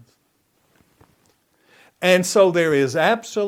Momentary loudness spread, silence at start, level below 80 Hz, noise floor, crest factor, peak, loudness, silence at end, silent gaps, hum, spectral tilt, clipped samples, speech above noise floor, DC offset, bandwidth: 4 LU; 2 s; -68 dBFS; -66 dBFS; 20 dB; -2 dBFS; -18 LUFS; 0 s; none; none; -4.5 dB/octave; under 0.1%; 48 dB; under 0.1%; 16.5 kHz